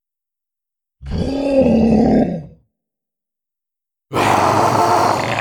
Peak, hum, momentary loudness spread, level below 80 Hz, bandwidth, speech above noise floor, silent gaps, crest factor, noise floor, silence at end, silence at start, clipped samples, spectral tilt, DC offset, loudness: -2 dBFS; none; 11 LU; -36 dBFS; 19 kHz; 73 dB; none; 14 dB; -86 dBFS; 0 s; 1 s; under 0.1%; -6 dB/octave; under 0.1%; -15 LUFS